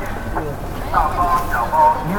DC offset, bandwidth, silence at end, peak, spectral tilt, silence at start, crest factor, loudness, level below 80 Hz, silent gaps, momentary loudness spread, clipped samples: under 0.1%; 18 kHz; 0 s; -2 dBFS; -6 dB/octave; 0 s; 16 dB; -19 LUFS; -28 dBFS; none; 11 LU; under 0.1%